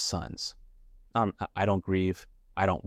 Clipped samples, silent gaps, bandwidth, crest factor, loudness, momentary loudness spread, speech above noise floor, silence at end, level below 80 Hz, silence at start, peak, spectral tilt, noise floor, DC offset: under 0.1%; none; 14.5 kHz; 18 dB; -31 LUFS; 10 LU; 25 dB; 0 s; -52 dBFS; 0 s; -12 dBFS; -5 dB/octave; -55 dBFS; under 0.1%